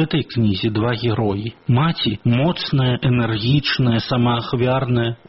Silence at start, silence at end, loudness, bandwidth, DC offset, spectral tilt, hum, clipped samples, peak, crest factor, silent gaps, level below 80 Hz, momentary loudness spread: 0 s; 0.15 s; -19 LUFS; 5.8 kHz; under 0.1%; -5.5 dB/octave; none; under 0.1%; -6 dBFS; 14 dB; none; -44 dBFS; 3 LU